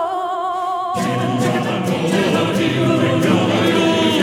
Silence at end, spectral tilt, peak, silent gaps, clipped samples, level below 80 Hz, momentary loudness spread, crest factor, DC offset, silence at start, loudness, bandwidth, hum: 0 s; -5.5 dB/octave; -2 dBFS; none; under 0.1%; -56 dBFS; 6 LU; 14 dB; under 0.1%; 0 s; -17 LUFS; 16.5 kHz; none